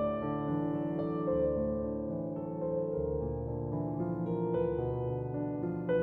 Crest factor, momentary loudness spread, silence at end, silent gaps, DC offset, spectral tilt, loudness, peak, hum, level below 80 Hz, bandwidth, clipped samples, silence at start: 14 dB; 5 LU; 0 s; none; under 0.1%; -11.5 dB/octave; -34 LUFS; -20 dBFS; none; -50 dBFS; 4.1 kHz; under 0.1%; 0 s